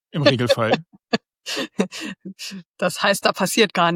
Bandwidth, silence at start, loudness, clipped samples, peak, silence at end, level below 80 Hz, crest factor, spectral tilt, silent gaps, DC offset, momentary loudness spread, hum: 17 kHz; 0.15 s; -21 LUFS; under 0.1%; -2 dBFS; 0 s; -64 dBFS; 20 dB; -4 dB/octave; 2.65-2.74 s; under 0.1%; 15 LU; none